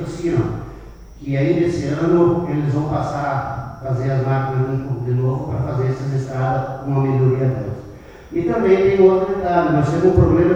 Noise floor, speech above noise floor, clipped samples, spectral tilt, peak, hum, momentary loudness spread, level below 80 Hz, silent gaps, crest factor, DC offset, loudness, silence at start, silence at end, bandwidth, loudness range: -38 dBFS; 21 dB; under 0.1%; -9 dB/octave; -2 dBFS; none; 11 LU; -38 dBFS; none; 16 dB; under 0.1%; -18 LUFS; 0 s; 0 s; 8.2 kHz; 4 LU